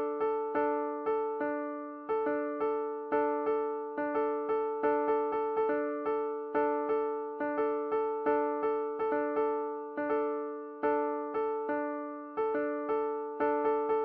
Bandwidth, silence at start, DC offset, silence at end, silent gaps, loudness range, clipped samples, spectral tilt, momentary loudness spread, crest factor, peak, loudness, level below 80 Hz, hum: 4.6 kHz; 0 s; under 0.1%; 0 s; none; 2 LU; under 0.1%; -4 dB/octave; 5 LU; 14 dB; -16 dBFS; -32 LUFS; -72 dBFS; none